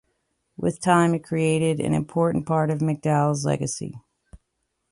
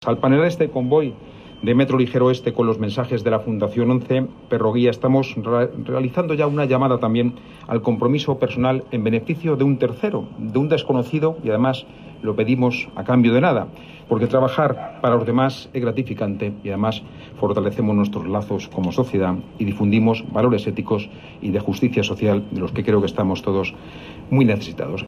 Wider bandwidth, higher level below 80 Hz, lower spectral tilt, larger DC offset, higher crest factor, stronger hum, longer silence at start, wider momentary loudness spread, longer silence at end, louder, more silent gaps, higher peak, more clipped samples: second, 11.5 kHz vs 13 kHz; about the same, -56 dBFS vs -52 dBFS; second, -6.5 dB/octave vs -8 dB/octave; neither; about the same, 18 dB vs 14 dB; neither; first, 0.6 s vs 0 s; about the same, 9 LU vs 8 LU; first, 0.55 s vs 0 s; second, -23 LUFS vs -20 LUFS; neither; about the same, -6 dBFS vs -6 dBFS; neither